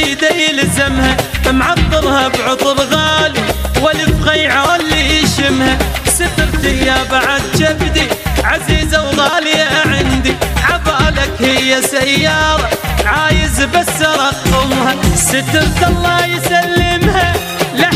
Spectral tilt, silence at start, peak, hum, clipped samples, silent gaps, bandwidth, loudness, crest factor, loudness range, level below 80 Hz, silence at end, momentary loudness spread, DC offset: -3.5 dB/octave; 0 s; 0 dBFS; none; under 0.1%; none; 16 kHz; -12 LUFS; 12 dB; 1 LU; -22 dBFS; 0 s; 3 LU; under 0.1%